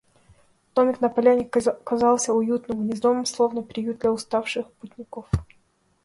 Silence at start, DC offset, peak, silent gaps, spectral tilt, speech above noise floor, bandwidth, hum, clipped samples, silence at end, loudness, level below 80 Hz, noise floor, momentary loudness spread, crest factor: 0.75 s; under 0.1%; -6 dBFS; none; -5 dB/octave; 41 dB; 11.5 kHz; none; under 0.1%; 0.6 s; -23 LUFS; -46 dBFS; -64 dBFS; 10 LU; 18 dB